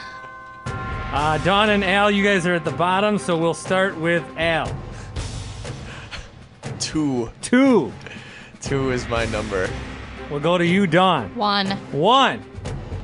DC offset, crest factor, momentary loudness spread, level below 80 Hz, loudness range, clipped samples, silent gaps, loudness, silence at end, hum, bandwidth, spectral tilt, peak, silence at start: under 0.1%; 20 dB; 18 LU; -40 dBFS; 6 LU; under 0.1%; none; -20 LUFS; 0 s; none; 11 kHz; -5 dB/octave; -2 dBFS; 0 s